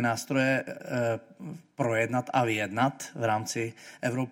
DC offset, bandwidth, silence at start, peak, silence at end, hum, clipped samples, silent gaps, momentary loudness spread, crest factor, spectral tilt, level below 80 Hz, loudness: under 0.1%; 16.5 kHz; 0 s; -10 dBFS; 0 s; none; under 0.1%; none; 9 LU; 18 dB; -5 dB/octave; -72 dBFS; -29 LUFS